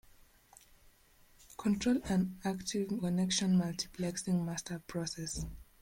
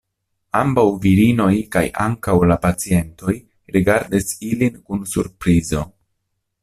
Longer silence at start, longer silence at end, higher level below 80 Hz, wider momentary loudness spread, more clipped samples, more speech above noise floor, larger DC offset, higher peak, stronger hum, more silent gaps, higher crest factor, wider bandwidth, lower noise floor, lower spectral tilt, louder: first, 1.5 s vs 0.55 s; second, 0.2 s vs 0.75 s; second, -56 dBFS vs -40 dBFS; about the same, 9 LU vs 10 LU; neither; second, 30 dB vs 56 dB; neither; second, -20 dBFS vs -2 dBFS; neither; neither; about the same, 16 dB vs 16 dB; first, 16.5 kHz vs 14.5 kHz; second, -64 dBFS vs -73 dBFS; second, -5 dB/octave vs -6.5 dB/octave; second, -35 LUFS vs -18 LUFS